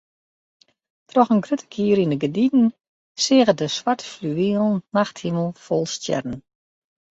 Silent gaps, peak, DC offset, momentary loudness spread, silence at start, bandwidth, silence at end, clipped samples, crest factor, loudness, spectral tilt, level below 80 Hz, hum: 2.88-3.15 s; -4 dBFS; under 0.1%; 9 LU; 1.15 s; 8 kHz; 0.7 s; under 0.1%; 18 dB; -21 LUFS; -5.5 dB/octave; -62 dBFS; none